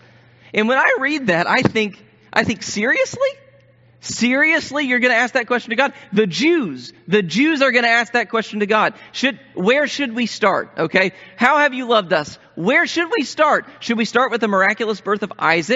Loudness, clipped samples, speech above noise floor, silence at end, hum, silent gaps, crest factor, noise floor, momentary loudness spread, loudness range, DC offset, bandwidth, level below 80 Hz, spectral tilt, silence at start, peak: -17 LUFS; under 0.1%; 33 dB; 0 s; none; none; 18 dB; -51 dBFS; 7 LU; 2 LU; under 0.1%; 8 kHz; -62 dBFS; -2.5 dB/octave; 0.55 s; 0 dBFS